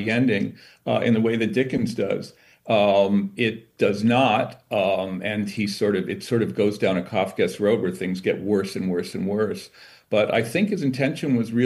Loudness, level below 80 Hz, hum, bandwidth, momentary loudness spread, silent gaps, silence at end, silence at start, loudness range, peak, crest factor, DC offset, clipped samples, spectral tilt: -23 LUFS; -64 dBFS; none; 12.5 kHz; 7 LU; none; 0 s; 0 s; 2 LU; -6 dBFS; 16 dB; under 0.1%; under 0.1%; -6.5 dB/octave